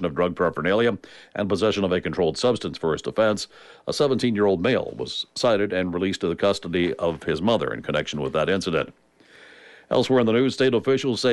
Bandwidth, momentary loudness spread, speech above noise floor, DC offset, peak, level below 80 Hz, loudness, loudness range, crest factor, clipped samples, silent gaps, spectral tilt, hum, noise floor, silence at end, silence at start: 11.5 kHz; 8 LU; 28 dB; under 0.1%; -8 dBFS; -54 dBFS; -23 LUFS; 2 LU; 14 dB; under 0.1%; none; -5.5 dB/octave; none; -51 dBFS; 0 s; 0 s